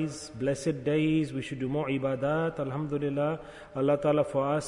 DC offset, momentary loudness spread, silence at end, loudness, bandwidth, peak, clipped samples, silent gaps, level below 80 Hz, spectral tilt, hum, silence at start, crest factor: under 0.1%; 7 LU; 0 s; -29 LUFS; 11 kHz; -14 dBFS; under 0.1%; none; -58 dBFS; -6.5 dB/octave; none; 0 s; 14 dB